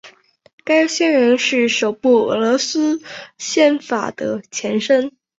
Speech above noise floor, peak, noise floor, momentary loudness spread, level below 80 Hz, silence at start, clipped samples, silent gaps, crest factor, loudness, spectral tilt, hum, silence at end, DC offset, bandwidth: 31 dB; -2 dBFS; -47 dBFS; 10 LU; -64 dBFS; 0.05 s; under 0.1%; 0.53-0.58 s; 16 dB; -17 LUFS; -3 dB/octave; none; 0.3 s; under 0.1%; 8 kHz